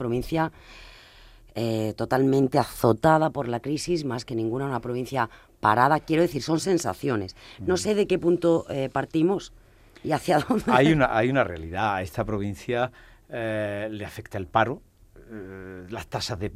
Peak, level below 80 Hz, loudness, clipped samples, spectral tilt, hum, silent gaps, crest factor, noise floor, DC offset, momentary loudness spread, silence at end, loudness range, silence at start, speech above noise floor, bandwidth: -2 dBFS; -50 dBFS; -25 LUFS; under 0.1%; -6 dB/octave; none; none; 22 dB; -50 dBFS; under 0.1%; 15 LU; 0 s; 6 LU; 0 s; 26 dB; 16 kHz